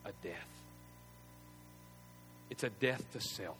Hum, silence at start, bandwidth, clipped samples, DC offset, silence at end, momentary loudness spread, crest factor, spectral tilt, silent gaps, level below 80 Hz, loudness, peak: 60 Hz at -60 dBFS; 0 s; over 20 kHz; under 0.1%; under 0.1%; 0 s; 21 LU; 26 dB; -4 dB/octave; none; -68 dBFS; -41 LUFS; -18 dBFS